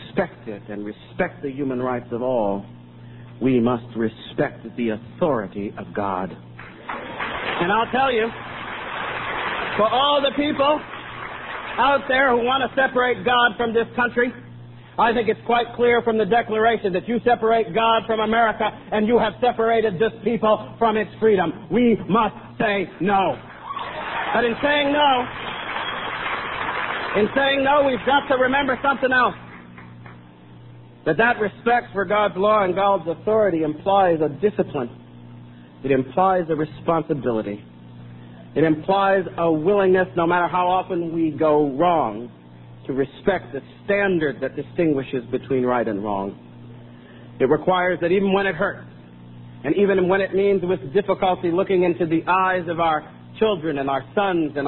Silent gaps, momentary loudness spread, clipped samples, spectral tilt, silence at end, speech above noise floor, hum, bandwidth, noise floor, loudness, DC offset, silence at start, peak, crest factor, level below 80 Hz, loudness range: none; 13 LU; under 0.1%; -10.5 dB/octave; 0 s; 24 dB; none; 4.2 kHz; -44 dBFS; -21 LUFS; 0.1%; 0 s; -4 dBFS; 18 dB; -52 dBFS; 5 LU